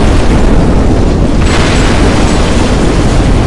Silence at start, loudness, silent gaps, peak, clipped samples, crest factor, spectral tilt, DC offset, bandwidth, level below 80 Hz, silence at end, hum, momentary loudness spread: 0 s; -9 LUFS; none; 0 dBFS; 0.5%; 6 dB; -6 dB/octave; under 0.1%; 11.5 kHz; -10 dBFS; 0 s; none; 1 LU